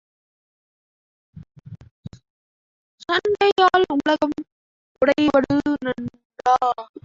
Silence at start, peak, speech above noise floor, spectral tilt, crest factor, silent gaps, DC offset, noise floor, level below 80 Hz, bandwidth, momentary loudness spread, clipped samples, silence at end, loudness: 1.35 s; -4 dBFS; over 71 dB; -5.5 dB/octave; 18 dB; 1.91-2.03 s, 2.30-2.98 s, 3.52-3.56 s, 4.52-4.95 s, 6.25-6.30 s; under 0.1%; under -90 dBFS; -54 dBFS; 7.6 kHz; 15 LU; under 0.1%; 0.2 s; -20 LUFS